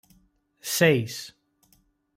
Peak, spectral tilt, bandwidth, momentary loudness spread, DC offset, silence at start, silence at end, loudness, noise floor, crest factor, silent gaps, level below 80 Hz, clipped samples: -8 dBFS; -4 dB/octave; 16 kHz; 18 LU; under 0.1%; 0.65 s; 0.85 s; -23 LUFS; -65 dBFS; 20 dB; none; -68 dBFS; under 0.1%